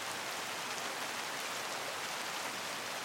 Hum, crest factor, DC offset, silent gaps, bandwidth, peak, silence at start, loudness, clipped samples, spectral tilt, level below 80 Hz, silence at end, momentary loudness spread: none; 16 dB; under 0.1%; none; 17 kHz; -24 dBFS; 0 s; -38 LUFS; under 0.1%; -0.5 dB/octave; -86 dBFS; 0 s; 1 LU